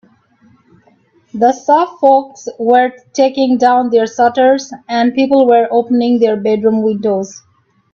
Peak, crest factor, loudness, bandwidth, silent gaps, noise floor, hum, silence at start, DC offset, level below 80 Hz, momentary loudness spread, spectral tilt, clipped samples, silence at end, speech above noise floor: 0 dBFS; 12 dB; -12 LUFS; 7.4 kHz; none; -52 dBFS; none; 1.35 s; under 0.1%; -60 dBFS; 7 LU; -5.5 dB/octave; under 0.1%; 0.55 s; 40 dB